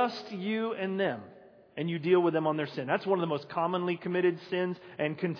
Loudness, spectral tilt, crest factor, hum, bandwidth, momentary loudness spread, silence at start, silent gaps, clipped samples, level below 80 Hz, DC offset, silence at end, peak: -31 LUFS; -8 dB/octave; 18 dB; none; 5.4 kHz; 9 LU; 0 s; none; under 0.1%; -82 dBFS; under 0.1%; 0 s; -12 dBFS